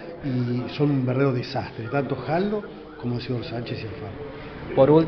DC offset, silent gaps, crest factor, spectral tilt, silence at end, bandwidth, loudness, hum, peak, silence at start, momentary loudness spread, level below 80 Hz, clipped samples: under 0.1%; none; 20 dB; -7 dB/octave; 0 s; 6.2 kHz; -26 LUFS; none; -4 dBFS; 0 s; 13 LU; -50 dBFS; under 0.1%